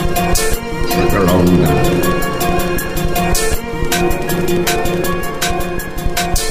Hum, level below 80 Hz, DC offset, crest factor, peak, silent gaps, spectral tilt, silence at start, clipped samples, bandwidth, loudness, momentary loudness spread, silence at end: none; -22 dBFS; under 0.1%; 12 dB; -2 dBFS; none; -4.5 dB/octave; 0 s; under 0.1%; 16 kHz; -16 LUFS; 7 LU; 0 s